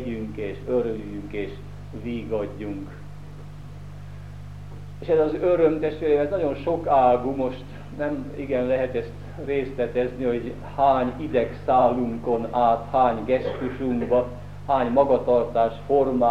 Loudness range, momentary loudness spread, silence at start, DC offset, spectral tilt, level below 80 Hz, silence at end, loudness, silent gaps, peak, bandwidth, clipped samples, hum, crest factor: 10 LU; 20 LU; 0 s; 0.7%; -8.5 dB/octave; -46 dBFS; 0 s; -24 LUFS; none; -6 dBFS; 8.8 kHz; under 0.1%; 50 Hz at -40 dBFS; 18 dB